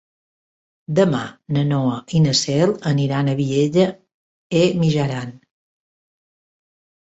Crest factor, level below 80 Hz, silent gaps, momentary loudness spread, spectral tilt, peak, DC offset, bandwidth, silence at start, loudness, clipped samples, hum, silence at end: 18 dB; -56 dBFS; 4.14-4.50 s; 7 LU; -6 dB/octave; -4 dBFS; under 0.1%; 8.2 kHz; 0.9 s; -19 LUFS; under 0.1%; none; 1.65 s